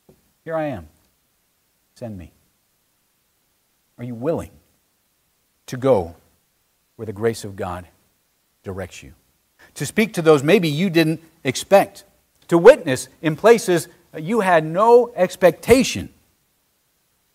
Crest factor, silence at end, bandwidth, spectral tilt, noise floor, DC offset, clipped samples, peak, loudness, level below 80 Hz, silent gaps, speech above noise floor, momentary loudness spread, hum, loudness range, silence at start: 20 dB; 1.3 s; 16 kHz; -5.5 dB/octave; -66 dBFS; under 0.1%; under 0.1%; 0 dBFS; -18 LUFS; -52 dBFS; none; 48 dB; 21 LU; none; 17 LU; 0.45 s